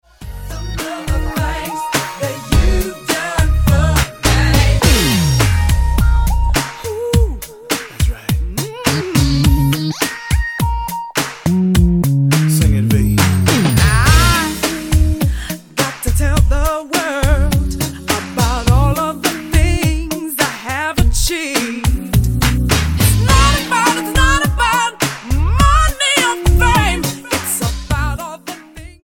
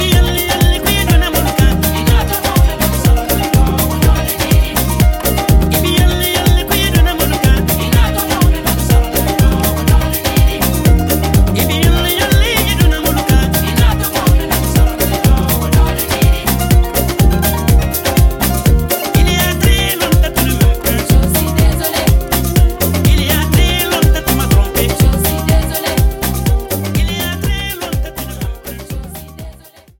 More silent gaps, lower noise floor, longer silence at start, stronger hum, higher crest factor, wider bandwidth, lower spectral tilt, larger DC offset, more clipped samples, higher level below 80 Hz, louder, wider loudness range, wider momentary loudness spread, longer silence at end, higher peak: neither; second, -34 dBFS vs -38 dBFS; first, 0.2 s vs 0 s; neither; about the same, 14 dB vs 12 dB; about the same, 17.5 kHz vs 17.5 kHz; about the same, -4.5 dB/octave vs -5 dB/octave; second, under 0.1% vs 0.2%; neither; about the same, -18 dBFS vs -16 dBFS; about the same, -15 LUFS vs -13 LUFS; about the same, 4 LU vs 2 LU; first, 9 LU vs 4 LU; second, 0.1 s vs 0.45 s; about the same, 0 dBFS vs 0 dBFS